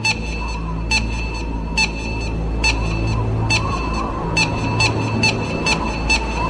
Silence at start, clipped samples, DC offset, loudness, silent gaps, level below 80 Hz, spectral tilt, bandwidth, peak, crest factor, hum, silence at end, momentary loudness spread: 0 s; under 0.1%; under 0.1%; -19 LUFS; none; -26 dBFS; -4 dB/octave; 10.5 kHz; -2 dBFS; 18 dB; none; 0 s; 7 LU